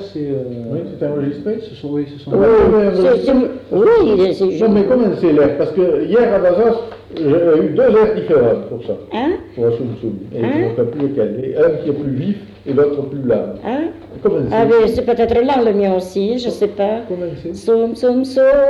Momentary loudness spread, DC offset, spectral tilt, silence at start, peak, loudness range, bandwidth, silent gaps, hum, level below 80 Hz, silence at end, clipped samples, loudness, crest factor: 11 LU; under 0.1%; -8 dB/octave; 0 s; -2 dBFS; 5 LU; 11 kHz; none; none; -42 dBFS; 0 s; under 0.1%; -15 LUFS; 12 dB